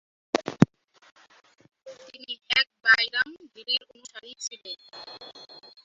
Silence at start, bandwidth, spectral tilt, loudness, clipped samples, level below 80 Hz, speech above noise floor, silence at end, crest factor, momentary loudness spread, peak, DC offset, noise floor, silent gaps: 0.35 s; 8.4 kHz; -4 dB/octave; -25 LUFS; under 0.1%; -64 dBFS; 7 dB; 0.6 s; 28 dB; 24 LU; -2 dBFS; under 0.1%; -41 dBFS; 1.12-1.16 s